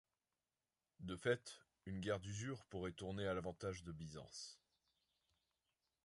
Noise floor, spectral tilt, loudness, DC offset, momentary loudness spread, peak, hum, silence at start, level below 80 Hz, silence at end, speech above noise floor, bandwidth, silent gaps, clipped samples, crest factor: under -90 dBFS; -5 dB/octave; -47 LUFS; under 0.1%; 14 LU; -26 dBFS; none; 1 s; -68 dBFS; 1.5 s; over 44 dB; 11.5 kHz; none; under 0.1%; 24 dB